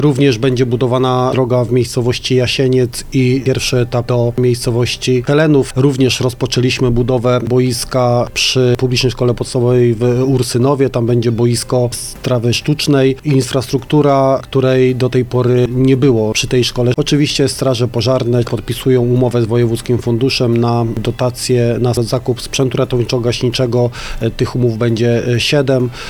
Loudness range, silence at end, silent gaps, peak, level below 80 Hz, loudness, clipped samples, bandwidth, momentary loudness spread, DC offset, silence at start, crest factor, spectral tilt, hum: 2 LU; 0 s; none; 0 dBFS; -34 dBFS; -14 LUFS; under 0.1%; 17 kHz; 4 LU; under 0.1%; 0 s; 12 dB; -6 dB/octave; none